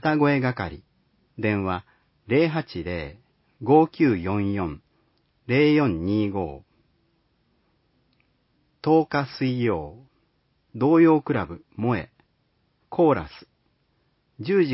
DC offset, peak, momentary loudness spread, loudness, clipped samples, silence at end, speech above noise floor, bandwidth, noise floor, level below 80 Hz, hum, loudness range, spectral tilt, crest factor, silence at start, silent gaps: under 0.1%; -4 dBFS; 16 LU; -23 LUFS; under 0.1%; 0 s; 47 dB; 5.8 kHz; -69 dBFS; -50 dBFS; none; 5 LU; -11.5 dB/octave; 20 dB; 0.05 s; none